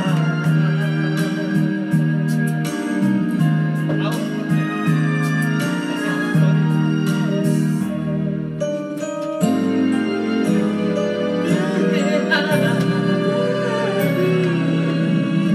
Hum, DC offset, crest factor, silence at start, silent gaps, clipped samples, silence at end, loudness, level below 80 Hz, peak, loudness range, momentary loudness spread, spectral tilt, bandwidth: none; under 0.1%; 14 dB; 0 s; none; under 0.1%; 0 s; -19 LUFS; -60 dBFS; -4 dBFS; 2 LU; 5 LU; -7 dB/octave; 13.5 kHz